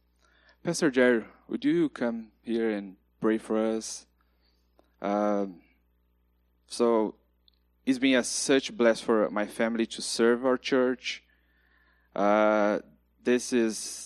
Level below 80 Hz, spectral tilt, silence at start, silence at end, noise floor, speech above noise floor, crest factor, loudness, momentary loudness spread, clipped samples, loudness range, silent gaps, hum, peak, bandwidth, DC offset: -66 dBFS; -4 dB/octave; 0.65 s; 0 s; -69 dBFS; 42 dB; 20 dB; -27 LUFS; 13 LU; under 0.1%; 6 LU; none; 60 Hz at -55 dBFS; -8 dBFS; 13.5 kHz; under 0.1%